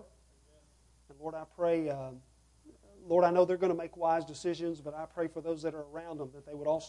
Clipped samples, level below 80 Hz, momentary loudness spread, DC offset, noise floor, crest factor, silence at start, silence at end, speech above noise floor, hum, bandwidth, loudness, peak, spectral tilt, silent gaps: under 0.1%; -66 dBFS; 16 LU; under 0.1%; -65 dBFS; 22 dB; 0 s; 0 s; 32 dB; none; 11 kHz; -33 LUFS; -14 dBFS; -6.5 dB/octave; none